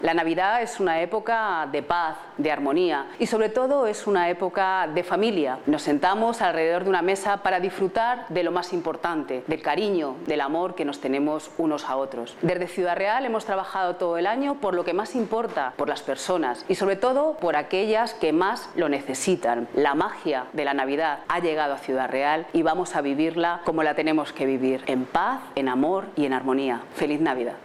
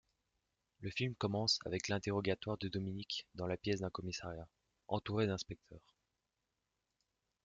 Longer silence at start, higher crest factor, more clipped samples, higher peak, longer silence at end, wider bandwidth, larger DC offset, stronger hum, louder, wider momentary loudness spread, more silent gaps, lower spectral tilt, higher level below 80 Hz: second, 0 s vs 0.8 s; about the same, 18 dB vs 20 dB; neither; first, -6 dBFS vs -22 dBFS; second, 0 s vs 1.65 s; first, 13.5 kHz vs 9 kHz; neither; neither; first, -25 LUFS vs -40 LUFS; second, 5 LU vs 13 LU; neither; about the same, -4.5 dB/octave vs -5 dB/octave; about the same, -64 dBFS vs -68 dBFS